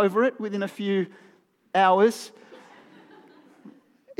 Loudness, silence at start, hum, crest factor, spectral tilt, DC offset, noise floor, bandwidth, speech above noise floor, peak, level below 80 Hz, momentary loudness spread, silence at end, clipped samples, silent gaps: -24 LUFS; 0 s; none; 20 dB; -5.5 dB/octave; under 0.1%; -53 dBFS; 15 kHz; 30 dB; -6 dBFS; under -90 dBFS; 16 LU; 0.5 s; under 0.1%; none